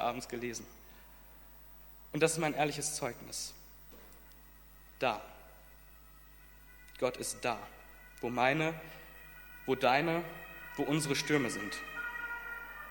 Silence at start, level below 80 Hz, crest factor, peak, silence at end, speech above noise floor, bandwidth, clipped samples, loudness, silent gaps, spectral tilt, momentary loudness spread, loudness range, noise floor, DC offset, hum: 0 s; -60 dBFS; 24 dB; -12 dBFS; 0 s; 23 dB; 17.5 kHz; under 0.1%; -35 LUFS; none; -4 dB/octave; 25 LU; 8 LU; -57 dBFS; under 0.1%; none